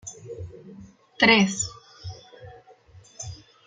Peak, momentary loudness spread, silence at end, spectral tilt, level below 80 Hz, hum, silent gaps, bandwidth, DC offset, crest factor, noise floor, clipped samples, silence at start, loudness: -4 dBFS; 25 LU; 0.3 s; -3.5 dB/octave; -58 dBFS; none; none; 9.6 kHz; under 0.1%; 24 dB; -52 dBFS; under 0.1%; 0.05 s; -20 LUFS